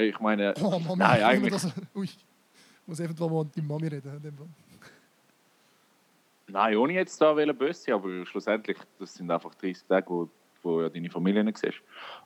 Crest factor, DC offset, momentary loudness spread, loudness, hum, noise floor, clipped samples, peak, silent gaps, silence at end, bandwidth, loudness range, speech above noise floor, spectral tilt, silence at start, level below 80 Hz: 24 dB; under 0.1%; 16 LU; -28 LUFS; none; -66 dBFS; under 0.1%; -6 dBFS; none; 0.05 s; 14.5 kHz; 8 LU; 38 dB; -6 dB/octave; 0 s; -80 dBFS